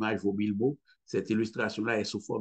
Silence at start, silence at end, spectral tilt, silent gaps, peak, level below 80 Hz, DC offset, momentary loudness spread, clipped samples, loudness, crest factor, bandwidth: 0 s; 0 s; -6 dB/octave; none; -14 dBFS; -72 dBFS; under 0.1%; 5 LU; under 0.1%; -31 LUFS; 16 dB; 8.8 kHz